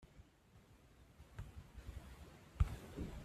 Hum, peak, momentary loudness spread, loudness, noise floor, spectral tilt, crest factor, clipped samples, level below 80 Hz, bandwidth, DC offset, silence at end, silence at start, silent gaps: none; -22 dBFS; 25 LU; -48 LUFS; -67 dBFS; -7 dB/octave; 26 dB; under 0.1%; -50 dBFS; 14.5 kHz; under 0.1%; 0 s; 0 s; none